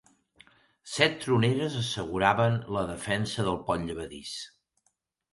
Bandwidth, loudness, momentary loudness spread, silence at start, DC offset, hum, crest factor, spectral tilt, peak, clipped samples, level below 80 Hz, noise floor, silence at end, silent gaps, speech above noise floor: 11.5 kHz; -28 LUFS; 14 LU; 0.85 s; under 0.1%; none; 24 dB; -5 dB/octave; -6 dBFS; under 0.1%; -54 dBFS; -75 dBFS; 0.85 s; none; 47 dB